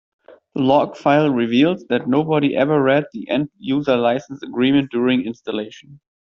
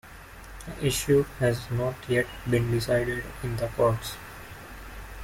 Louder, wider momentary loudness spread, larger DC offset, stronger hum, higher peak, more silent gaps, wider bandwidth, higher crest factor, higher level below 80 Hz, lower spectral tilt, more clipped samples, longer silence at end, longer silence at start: first, -18 LUFS vs -27 LUFS; second, 10 LU vs 19 LU; neither; neither; first, -4 dBFS vs -10 dBFS; neither; second, 7 kHz vs 16.5 kHz; about the same, 16 dB vs 18 dB; second, -60 dBFS vs -44 dBFS; about the same, -5 dB/octave vs -5.5 dB/octave; neither; first, 0.35 s vs 0 s; first, 0.55 s vs 0.05 s